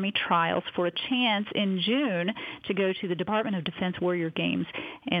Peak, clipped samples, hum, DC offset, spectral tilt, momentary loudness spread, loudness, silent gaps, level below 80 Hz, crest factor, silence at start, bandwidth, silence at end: -10 dBFS; under 0.1%; none; under 0.1%; -8 dB/octave; 7 LU; -28 LUFS; none; -68 dBFS; 18 dB; 0 s; 5 kHz; 0 s